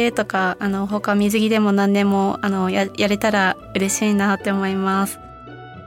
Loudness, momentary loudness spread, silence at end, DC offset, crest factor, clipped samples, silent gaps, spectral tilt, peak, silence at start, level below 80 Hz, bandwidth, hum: -19 LUFS; 6 LU; 0 s; under 0.1%; 16 dB; under 0.1%; none; -5 dB/octave; -4 dBFS; 0 s; -52 dBFS; 16.5 kHz; none